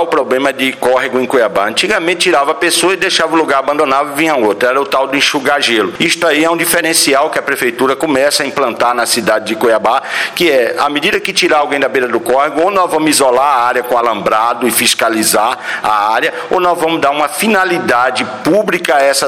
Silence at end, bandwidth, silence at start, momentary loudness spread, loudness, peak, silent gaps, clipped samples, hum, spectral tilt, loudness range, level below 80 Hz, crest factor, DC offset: 0 s; 16.5 kHz; 0 s; 4 LU; -11 LUFS; 0 dBFS; none; under 0.1%; none; -2.5 dB/octave; 1 LU; -52 dBFS; 10 dB; under 0.1%